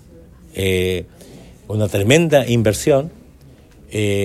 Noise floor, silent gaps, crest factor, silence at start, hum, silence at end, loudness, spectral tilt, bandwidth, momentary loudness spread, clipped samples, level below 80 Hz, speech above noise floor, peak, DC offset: -45 dBFS; none; 18 dB; 0.55 s; none; 0 s; -17 LUFS; -5.5 dB/octave; 15.5 kHz; 15 LU; under 0.1%; -46 dBFS; 28 dB; 0 dBFS; under 0.1%